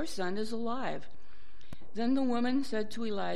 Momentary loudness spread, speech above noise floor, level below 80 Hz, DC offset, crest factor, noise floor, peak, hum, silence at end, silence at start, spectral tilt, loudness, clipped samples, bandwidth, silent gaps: 15 LU; 26 dB; -62 dBFS; 3%; 14 dB; -60 dBFS; -18 dBFS; none; 0 s; 0 s; -5.5 dB/octave; -34 LUFS; under 0.1%; 13 kHz; none